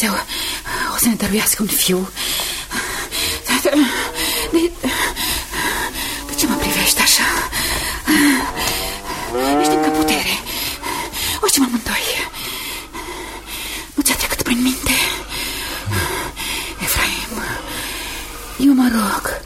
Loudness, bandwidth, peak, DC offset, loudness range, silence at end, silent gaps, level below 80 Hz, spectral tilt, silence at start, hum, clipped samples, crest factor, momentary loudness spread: -18 LUFS; 16.5 kHz; -2 dBFS; under 0.1%; 4 LU; 0 s; none; -36 dBFS; -2.5 dB/octave; 0 s; none; under 0.1%; 18 dB; 10 LU